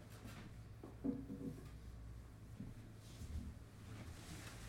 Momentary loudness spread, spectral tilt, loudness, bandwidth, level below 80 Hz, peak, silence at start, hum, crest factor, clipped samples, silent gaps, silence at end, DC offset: 11 LU; -6 dB/octave; -52 LUFS; 16 kHz; -58 dBFS; -30 dBFS; 0 s; none; 22 dB; under 0.1%; none; 0 s; under 0.1%